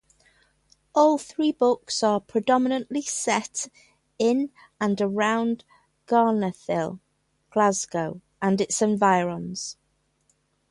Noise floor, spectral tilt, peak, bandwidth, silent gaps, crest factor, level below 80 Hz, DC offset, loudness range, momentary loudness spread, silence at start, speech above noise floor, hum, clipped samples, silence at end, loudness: -69 dBFS; -4.5 dB/octave; -6 dBFS; 11.5 kHz; none; 18 dB; -66 dBFS; under 0.1%; 2 LU; 12 LU; 0.95 s; 46 dB; none; under 0.1%; 1 s; -24 LUFS